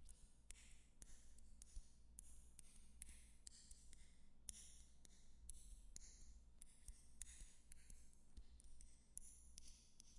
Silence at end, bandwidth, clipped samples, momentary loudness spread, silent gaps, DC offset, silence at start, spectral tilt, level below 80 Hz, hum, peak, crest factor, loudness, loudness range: 0 s; 11.5 kHz; under 0.1%; 10 LU; none; under 0.1%; 0 s; -2 dB/octave; -64 dBFS; none; -30 dBFS; 30 dB; -64 LUFS; 2 LU